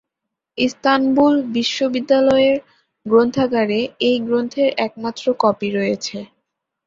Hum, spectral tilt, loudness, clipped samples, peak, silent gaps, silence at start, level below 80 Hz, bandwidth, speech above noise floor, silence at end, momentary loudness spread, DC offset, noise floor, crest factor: none; -5 dB/octave; -18 LUFS; under 0.1%; -2 dBFS; none; 0.55 s; -58 dBFS; 7.6 kHz; 64 dB; 0.6 s; 9 LU; under 0.1%; -81 dBFS; 16 dB